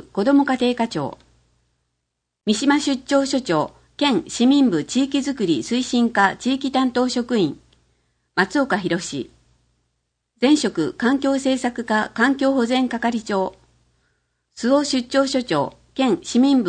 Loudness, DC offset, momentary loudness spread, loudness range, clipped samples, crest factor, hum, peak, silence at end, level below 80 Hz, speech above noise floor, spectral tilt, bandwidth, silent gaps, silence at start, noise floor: -20 LUFS; under 0.1%; 7 LU; 3 LU; under 0.1%; 18 dB; none; -2 dBFS; 0 s; -58 dBFS; 59 dB; -4.5 dB/octave; 9.8 kHz; none; 0.15 s; -78 dBFS